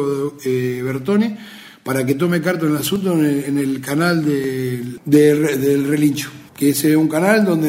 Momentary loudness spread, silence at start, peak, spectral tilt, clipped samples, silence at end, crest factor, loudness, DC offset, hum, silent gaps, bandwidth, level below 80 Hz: 9 LU; 0 s; 0 dBFS; -6 dB/octave; under 0.1%; 0 s; 16 dB; -17 LUFS; under 0.1%; none; none; 16.5 kHz; -58 dBFS